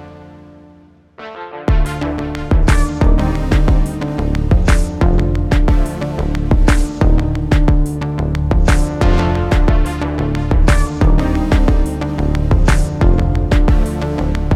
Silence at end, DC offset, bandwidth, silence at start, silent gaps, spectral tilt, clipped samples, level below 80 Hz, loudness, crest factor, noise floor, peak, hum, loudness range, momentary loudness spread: 0 s; under 0.1%; 12 kHz; 0 s; none; -7 dB/octave; under 0.1%; -14 dBFS; -16 LUFS; 12 dB; -45 dBFS; 0 dBFS; none; 2 LU; 6 LU